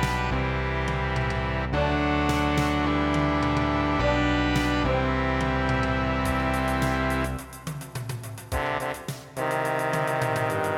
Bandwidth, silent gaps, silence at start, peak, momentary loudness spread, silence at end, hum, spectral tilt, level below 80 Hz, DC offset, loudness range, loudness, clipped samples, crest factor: 17 kHz; none; 0 s; -10 dBFS; 10 LU; 0 s; none; -6 dB/octave; -34 dBFS; under 0.1%; 5 LU; -26 LUFS; under 0.1%; 14 dB